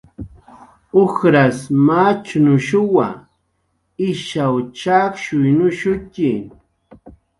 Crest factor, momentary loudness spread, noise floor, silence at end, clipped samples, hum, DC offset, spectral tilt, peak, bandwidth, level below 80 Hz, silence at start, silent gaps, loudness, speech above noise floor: 16 dB; 11 LU; -67 dBFS; 0.3 s; under 0.1%; none; under 0.1%; -7 dB/octave; 0 dBFS; 11.5 kHz; -50 dBFS; 0.2 s; none; -16 LUFS; 52 dB